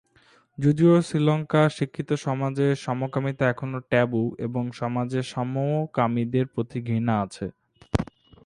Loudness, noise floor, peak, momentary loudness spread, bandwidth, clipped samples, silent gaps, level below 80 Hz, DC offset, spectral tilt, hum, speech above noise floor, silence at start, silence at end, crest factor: -25 LUFS; -59 dBFS; -6 dBFS; 9 LU; 11 kHz; under 0.1%; none; -50 dBFS; under 0.1%; -7.5 dB/octave; none; 36 dB; 0.6 s; 0.4 s; 20 dB